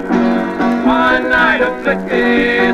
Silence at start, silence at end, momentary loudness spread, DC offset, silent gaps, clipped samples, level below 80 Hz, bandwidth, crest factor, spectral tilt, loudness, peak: 0 s; 0 s; 4 LU; 0.2%; none; under 0.1%; -38 dBFS; 9.8 kHz; 12 dB; -6 dB/octave; -13 LUFS; -2 dBFS